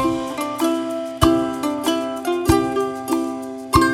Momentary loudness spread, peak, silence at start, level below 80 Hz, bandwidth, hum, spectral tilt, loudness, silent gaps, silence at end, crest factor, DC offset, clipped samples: 7 LU; 0 dBFS; 0 s; -36 dBFS; 16.5 kHz; none; -5 dB/octave; -21 LUFS; none; 0 s; 20 dB; under 0.1%; under 0.1%